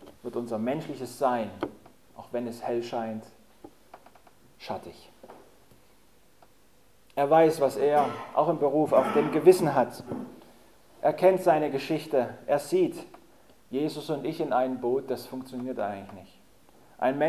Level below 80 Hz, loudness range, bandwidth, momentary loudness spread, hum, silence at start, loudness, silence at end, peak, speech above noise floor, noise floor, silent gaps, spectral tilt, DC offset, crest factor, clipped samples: -68 dBFS; 16 LU; 15 kHz; 17 LU; none; 0 s; -27 LUFS; 0 s; -6 dBFS; 36 dB; -62 dBFS; none; -6 dB/octave; 0.1%; 22 dB; under 0.1%